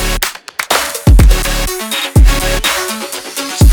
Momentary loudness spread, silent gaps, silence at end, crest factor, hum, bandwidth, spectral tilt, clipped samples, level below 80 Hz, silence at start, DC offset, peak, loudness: 10 LU; none; 0 s; 10 dB; none; over 20 kHz; -4 dB/octave; 1%; -12 dBFS; 0 s; under 0.1%; 0 dBFS; -13 LUFS